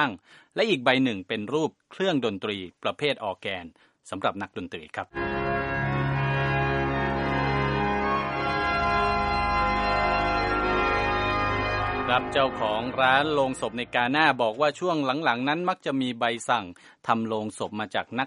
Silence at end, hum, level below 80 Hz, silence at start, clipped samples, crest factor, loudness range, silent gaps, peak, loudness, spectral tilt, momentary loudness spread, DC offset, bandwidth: 0 s; none; -42 dBFS; 0 s; under 0.1%; 22 dB; 6 LU; none; -4 dBFS; -26 LUFS; -5.5 dB/octave; 10 LU; under 0.1%; 11 kHz